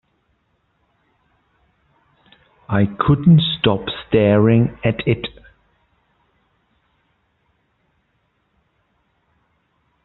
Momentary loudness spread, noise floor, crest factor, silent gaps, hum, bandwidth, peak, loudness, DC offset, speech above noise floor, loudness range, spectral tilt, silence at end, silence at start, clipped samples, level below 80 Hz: 10 LU; -66 dBFS; 20 dB; none; none; 4.2 kHz; -2 dBFS; -17 LUFS; under 0.1%; 51 dB; 11 LU; -6 dB/octave; 4.75 s; 2.7 s; under 0.1%; -48 dBFS